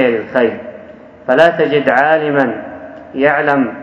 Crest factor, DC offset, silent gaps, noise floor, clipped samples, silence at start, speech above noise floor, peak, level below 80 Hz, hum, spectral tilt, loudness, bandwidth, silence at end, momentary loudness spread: 14 dB; under 0.1%; none; -36 dBFS; 0.3%; 0 s; 24 dB; 0 dBFS; -56 dBFS; none; -7 dB/octave; -13 LUFS; 8.2 kHz; 0 s; 17 LU